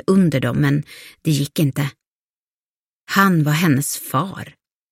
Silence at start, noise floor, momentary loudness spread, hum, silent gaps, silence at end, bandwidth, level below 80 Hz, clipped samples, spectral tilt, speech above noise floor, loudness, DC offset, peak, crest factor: 0.1 s; under -90 dBFS; 12 LU; none; 2.07-3.05 s; 0.4 s; 16.5 kHz; -54 dBFS; under 0.1%; -5.5 dB/octave; over 72 dB; -19 LUFS; under 0.1%; -2 dBFS; 18 dB